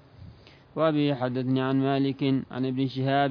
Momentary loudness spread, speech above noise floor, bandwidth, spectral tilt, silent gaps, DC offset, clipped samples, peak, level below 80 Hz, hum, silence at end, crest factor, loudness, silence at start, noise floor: 4 LU; 25 dB; 5.4 kHz; -9.5 dB/octave; none; under 0.1%; under 0.1%; -10 dBFS; -64 dBFS; none; 0 s; 16 dB; -26 LUFS; 0.2 s; -50 dBFS